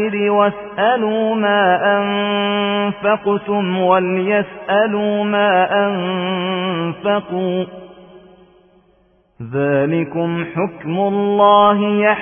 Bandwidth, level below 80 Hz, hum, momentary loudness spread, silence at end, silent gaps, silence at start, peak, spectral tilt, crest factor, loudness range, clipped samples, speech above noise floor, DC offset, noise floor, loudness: 3.6 kHz; -60 dBFS; none; 7 LU; 0 s; none; 0 s; -2 dBFS; -11 dB/octave; 16 dB; 6 LU; under 0.1%; 40 dB; under 0.1%; -56 dBFS; -16 LUFS